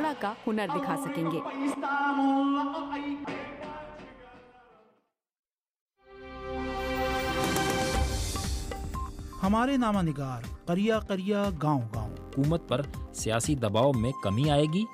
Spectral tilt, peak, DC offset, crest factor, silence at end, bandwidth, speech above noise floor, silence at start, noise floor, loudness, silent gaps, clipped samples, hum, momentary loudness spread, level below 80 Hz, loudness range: -5.5 dB/octave; -12 dBFS; under 0.1%; 18 dB; 0 s; 15.5 kHz; 44 dB; 0 s; -72 dBFS; -29 LUFS; 5.39-5.43 s, 5.81-5.86 s; under 0.1%; none; 12 LU; -42 dBFS; 11 LU